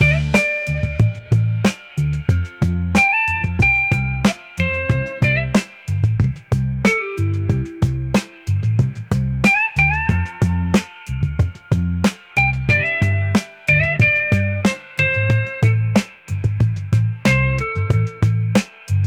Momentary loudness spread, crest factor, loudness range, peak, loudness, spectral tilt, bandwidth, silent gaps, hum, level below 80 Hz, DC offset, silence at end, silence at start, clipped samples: 7 LU; 14 dB; 2 LU; -4 dBFS; -18 LUFS; -6.5 dB/octave; 14 kHz; none; none; -34 dBFS; under 0.1%; 0 s; 0 s; under 0.1%